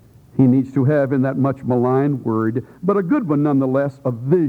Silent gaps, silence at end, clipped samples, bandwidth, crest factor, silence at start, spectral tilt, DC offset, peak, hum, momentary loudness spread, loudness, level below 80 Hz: none; 0 s; under 0.1%; 4.5 kHz; 16 dB; 0.35 s; -11 dB/octave; under 0.1%; -2 dBFS; none; 7 LU; -18 LUFS; -58 dBFS